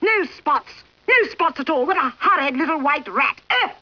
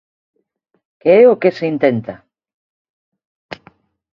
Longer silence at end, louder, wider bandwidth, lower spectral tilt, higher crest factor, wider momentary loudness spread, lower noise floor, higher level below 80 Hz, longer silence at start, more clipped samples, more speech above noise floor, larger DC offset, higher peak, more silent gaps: second, 0.1 s vs 0.6 s; second, -19 LUFS vs -13 LUFS; second, 5.4 kHz vs 6 kHz; second, -4 dB/octave vs -8.5 dB/octave; about the same, 14 dB vs 18 dB; second, 5 LU vs 25 LU; second, -40 dBFS vs -51 dBFS; about the same, -62 dBFS vs -62 dBFS; second, 0 s vs 1.05 s; neither; second, 20 dB vs 38 dB; neither; second, -6 dBFS vs 0 dBFS; second, none vs 2.54-3.12 s, 3.25-3.49 s